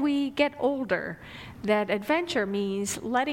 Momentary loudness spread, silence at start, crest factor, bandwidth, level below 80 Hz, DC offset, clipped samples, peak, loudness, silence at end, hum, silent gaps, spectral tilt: 10 LU; 0 s; 18 dB; 16 kHz; -58 dBFS; under 0.1%; under 0.1%; -10 dBFS; -28 LUFS; 0 s; none; none; -4.5 dB/octave